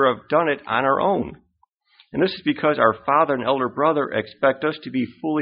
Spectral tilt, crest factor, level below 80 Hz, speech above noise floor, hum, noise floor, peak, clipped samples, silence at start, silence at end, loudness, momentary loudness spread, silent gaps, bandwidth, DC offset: -3.5 dB/octave; 20 dB; -58 dBFS; 44 dB; none; -64 dBFS; -2 dBFS; under 0.1%; 0 s; 0 s; -21 LUFS; 7 LU; 1.74-1.78 s; 5.2 kHz; under 0.1%